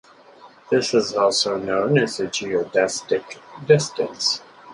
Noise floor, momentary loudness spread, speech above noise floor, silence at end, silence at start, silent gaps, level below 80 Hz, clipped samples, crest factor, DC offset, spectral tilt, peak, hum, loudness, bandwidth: -47 dBFS; 7 LU; 27 dB; 0 s; 0.45 s; none; -62 dBFS; under 0.1%; 20 dB; under 0.1%; -4 dB/octave; -2 dBFS; none; -21 LUFS; 11.5 kHz